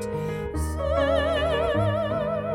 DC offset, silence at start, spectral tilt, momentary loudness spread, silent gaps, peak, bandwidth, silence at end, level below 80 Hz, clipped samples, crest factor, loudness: under 0.1%; 0 s; -6 dB/octave; 7 LU; none; -12 dBFS; 16.5 kHz; 0 s; -38 dBFS; under 0.1%; 14 dB; -25 LUFS